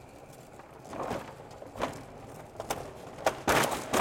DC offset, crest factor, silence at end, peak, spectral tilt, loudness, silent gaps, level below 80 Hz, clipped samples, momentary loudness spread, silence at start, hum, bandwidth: under 0.1%; 24 dB; 0 s; -10 dBFS; -3.5 dB/octave; -33 LUFS; none; -56 dBFS; under 0.1%; 22 LU; 0 s; none; 17 kHz